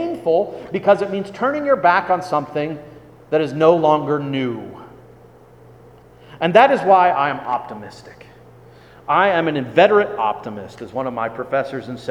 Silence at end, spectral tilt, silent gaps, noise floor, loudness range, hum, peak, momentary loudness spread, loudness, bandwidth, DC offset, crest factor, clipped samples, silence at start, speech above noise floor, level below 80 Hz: 0 s; -6.5 dB/octave; none; -45 dBFS; 2 LU; none; 0 dBFS; 16 LU; -18 LUFS; 11.5 kHz; under 0.1%; 18 dB; under 0.1%; 0 s; 28 dB; -58 dBFS